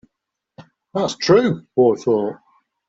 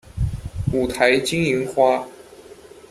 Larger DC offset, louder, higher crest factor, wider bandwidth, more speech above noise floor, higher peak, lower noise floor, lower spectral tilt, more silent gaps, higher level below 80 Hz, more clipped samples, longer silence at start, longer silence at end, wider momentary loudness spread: neither; about the same, -18 LUFS vs -20 LUFS; about the same, 18 dB vs 20 dB; second, 8 kHz vs 14 kHz; first, 63 dB vs 25 dB; about the same, -2 dBFS vs 0 dBFS; first, -81 dBFS vs -43 dBFS; about the same, -6 dB/octave vs -5 dB/octave; neither; second, -58 dBFS vs -36 dBFS; neither; first, 0.6 s vs 0.15 s; first, 0.55 s vs 0.4 s; about the same, 10 LU vs 10 LU